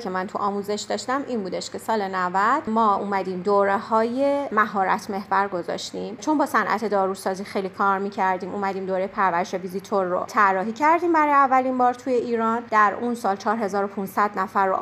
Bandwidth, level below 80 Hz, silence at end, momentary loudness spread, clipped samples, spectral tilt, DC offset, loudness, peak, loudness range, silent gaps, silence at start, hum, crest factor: 15.5 kHz; -68 dBFS; 0 s; 8 LU; under 0.1%; -5 dB/octave; under 0.1%; -23 LUFS; -6 dBFS; 4 LU; none; 0 s; none; 18 dB